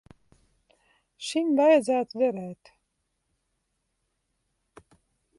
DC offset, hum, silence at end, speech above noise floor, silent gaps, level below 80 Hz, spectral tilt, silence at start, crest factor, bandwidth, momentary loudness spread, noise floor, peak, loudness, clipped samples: under 0.1%; none; 2.85 s; 54 dB; none; -72 dBFS; -5 dB/octave; 1.2 s; 20 dB; 11.5 kHz; 18 LU; -78 dBFS; -8 dBFS; -24 LUFS; under 0.1%